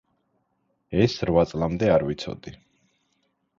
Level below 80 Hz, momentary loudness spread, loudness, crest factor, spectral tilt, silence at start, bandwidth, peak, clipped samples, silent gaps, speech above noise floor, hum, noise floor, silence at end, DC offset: -46 dBFS; 15 LU; -23 LUFS; 20 dB; -7 dB/octave; 0.9 s; 7.6 kHz; -6 dBFS; under 0.1%; none; 49 dB; none; -72 dBFS; 1.05 s; under 0.1%